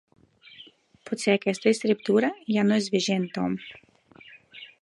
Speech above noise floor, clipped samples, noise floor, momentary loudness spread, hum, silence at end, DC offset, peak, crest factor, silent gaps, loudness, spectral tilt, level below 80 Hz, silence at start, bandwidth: 28 dB; under 0.1%; -52 dBFS; 22 LU; none; 0.15 s; under 0.1%; -6 dBFS; 20 dB; none; -25 LUFS; -5 dB/octave; -70 dBFS; 0.6 s; 11.5 kHz